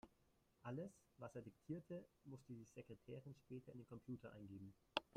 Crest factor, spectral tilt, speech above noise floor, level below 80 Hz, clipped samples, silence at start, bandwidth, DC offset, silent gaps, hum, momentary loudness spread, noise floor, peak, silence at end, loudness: 32 dB; -6 dB/octave; 24 dB; -82 dBFS; under 0.1%; 0.05 s; 14.5 kHz; under 0.1%; none; none; 8 LU; -80 dBFS; -24 dBFS; 0 s; -56 LUFS